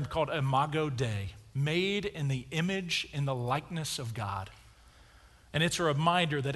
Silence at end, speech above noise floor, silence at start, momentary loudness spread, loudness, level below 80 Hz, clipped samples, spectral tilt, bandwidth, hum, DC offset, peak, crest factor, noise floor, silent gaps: 0 s; 27 dB; 0 s; 9 LU; -31 LUFS; -56 dBFS; under 0.1%; -5 dB/octave; 12 kHz; none; under 0.1%; -12 dBFS; 20 dB; -58 dBFS; none